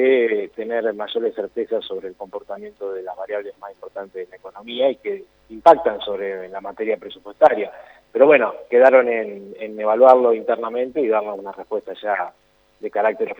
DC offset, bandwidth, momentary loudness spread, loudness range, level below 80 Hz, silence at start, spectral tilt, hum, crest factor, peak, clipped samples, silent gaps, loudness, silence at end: under 0.1%; over 20 kHz; 19 LU; 12 LU; -64 dBFS; 0 s; -6 dB/octave; none; 20 dB; 0 dBFS; under 0.1%; none; -19 LUFS; 0.05 s